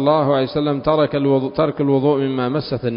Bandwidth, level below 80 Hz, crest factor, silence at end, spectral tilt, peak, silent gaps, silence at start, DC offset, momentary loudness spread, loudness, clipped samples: 5.4 kHz; -48 dBFS; 14 dB; 0 s; -12.5 dB/octave; -2 dBFS; none; 0 s; under 0.1%; 4 LU; -18 LUFS; under 0.1%